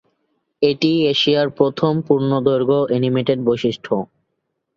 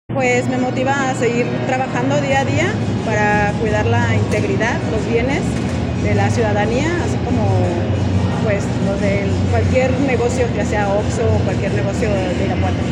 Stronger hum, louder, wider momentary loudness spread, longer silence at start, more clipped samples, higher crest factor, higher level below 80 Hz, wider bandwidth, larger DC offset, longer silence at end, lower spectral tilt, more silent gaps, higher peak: neither; about the same, -18 LUFS vs -17 LUFS; first, 6 LU vs 3 LU; first, 0.6 s vs 0.1 s; neither; about the same, 18 dB vs 14 dB; second, -58 dBFS vs -32 dBFS; second, 7.2 kHz vs 10.5 kHz; neither; first, 0.7 s vs 0 s; about the same, -7 dB/octave vs -6.5 dB/octave; neither; about the same, -2 dBFS vs -2 dBFS